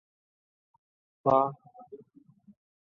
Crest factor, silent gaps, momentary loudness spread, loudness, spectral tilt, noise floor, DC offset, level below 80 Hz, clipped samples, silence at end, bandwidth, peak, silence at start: 24 dB; none; 25 LU; -27 LUFS; -9.5 dB/octave; -59 dBFS; under 0.1%; -72 dBFS; under 0.1%; 0.9 s; 6.4 kHz; -10 dBFS; 1.25 s